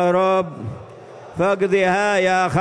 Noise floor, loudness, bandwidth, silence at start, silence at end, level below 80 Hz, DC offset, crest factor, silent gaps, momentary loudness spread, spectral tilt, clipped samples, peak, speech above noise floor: -39 dBFS; -18 LUFS; 10.5 kHz; 0 s; 0 s; -54 dBFS; under 0.1%; 12 dB; none; 20 LU; -5.5 dB/octave; under 0.1%; -6 dBFS; 21 dB